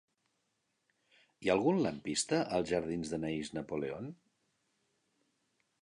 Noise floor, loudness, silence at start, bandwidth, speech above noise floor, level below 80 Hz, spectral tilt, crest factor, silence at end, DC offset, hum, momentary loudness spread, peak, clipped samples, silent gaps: -81 dBFS; -35 LUFS; 1.4 s; 11 kHz; 47 dB; -66 dBFS; -4.5 dB/octave; 22 dB; 1.7 s; under 0.1%; none; 9 LU; -16 dBFS; under 0.1%; none